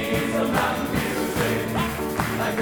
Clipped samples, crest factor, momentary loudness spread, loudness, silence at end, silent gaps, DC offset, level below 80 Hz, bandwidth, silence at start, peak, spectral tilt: under 0.1%; 16 dB; 3 LU; -24 LUFS; 0 s; none; under 0.1%; -42 dBFS; over 20 kHz; 0 s; -8 dBFS; -5 dB/octave